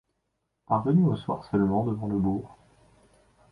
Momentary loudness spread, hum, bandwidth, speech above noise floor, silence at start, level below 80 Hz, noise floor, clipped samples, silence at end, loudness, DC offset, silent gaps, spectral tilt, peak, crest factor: 8 LU; none; 5 kHz; 53 dB; 0.7 s; -54 dBFS; -78 dBFS; under 0.1%; 1 s; -26 LUFS; under 0.1%; none; -10.5 dB/octave; -10 dBFS; 18 dB